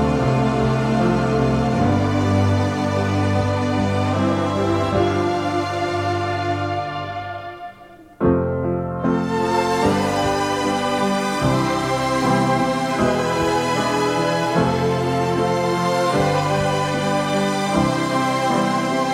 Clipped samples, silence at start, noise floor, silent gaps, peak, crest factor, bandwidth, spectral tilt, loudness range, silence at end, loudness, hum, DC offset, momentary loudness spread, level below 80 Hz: under 0.1%; 0 s; -43 dBFS; none; -4 dBFS; 16 dB; 15.5 kHz; -6 dB/octave; 4 LU; 0 s; -20 LUFS; none; under 0.1%; 4 LU; -40 dBFS